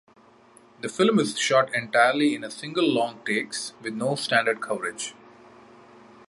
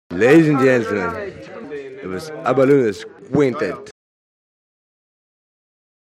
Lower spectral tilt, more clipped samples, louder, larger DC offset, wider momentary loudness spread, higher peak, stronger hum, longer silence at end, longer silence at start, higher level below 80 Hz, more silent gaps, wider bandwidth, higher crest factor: second, -3.5 dB/octave vs -7 dB/octave; neither; second, -24 LUFS vs -16 LUFS; neither; second, 12 LU vs 20 LU; second, -4 dBFS vs 0 dBFS; neither; second, 1.15 s vs 2.1 s; first, 0.85 s vs 0.1 s; second, -72 dBFS vs -58 dBFS; neither; second, 11.5 kHz vs 13 kHz; about the same, 20 dB vs 18 dB